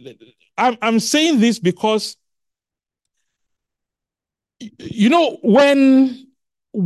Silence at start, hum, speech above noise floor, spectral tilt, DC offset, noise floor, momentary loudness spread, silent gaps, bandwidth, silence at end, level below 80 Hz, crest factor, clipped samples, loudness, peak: 0.05 s; none; 73 dB; -4.5 dB/octave; under 0.1%; -88 dBFS; 17 LU; none; 12.5 kHz; 0 s; -62 dBFS; 16 dB; under 0.1%; -15 LUFS; -2 dBFS